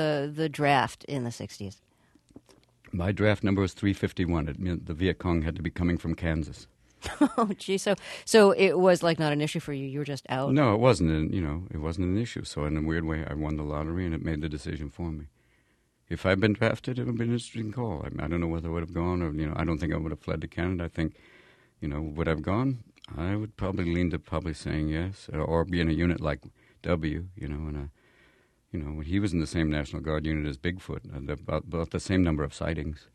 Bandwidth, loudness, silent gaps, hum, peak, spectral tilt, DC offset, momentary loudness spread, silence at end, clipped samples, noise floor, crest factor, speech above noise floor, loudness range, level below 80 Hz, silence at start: 12.5 kHz; -29 LUFS; none; none; -6 dBFS; -6.5 dB/octave; under 0.1%; 12 LU; 0.15 s; under 0.1%; -68 dBFS; 22 dB; 40 dB; 8 LU; -42 dBFS; 0 s